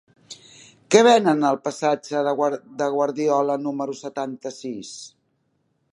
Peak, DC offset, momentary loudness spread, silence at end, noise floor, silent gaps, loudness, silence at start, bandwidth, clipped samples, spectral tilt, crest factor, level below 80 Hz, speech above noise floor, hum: -2 dBFS; under 0.1%; 22 LU; 0.85 s; -69 dBFS; none; -21 LUFS; 0.3 s; 11.5 kHz; under 0.1%; -4.5 dB/octave; 22 dB; -76 dBFS; 48 dB; none